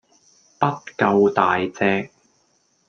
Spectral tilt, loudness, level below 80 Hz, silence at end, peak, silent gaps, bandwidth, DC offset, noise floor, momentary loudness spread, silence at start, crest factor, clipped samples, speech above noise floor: -6.5 dB/octave; -20 LUFS; -66 dBFS; 0.85 s; -2 dBFS; none; 7 kHz; under 0.1%; -64 dBFS; 8 LU; 0.6 s; 20 dB; under 0.1%; 45 dB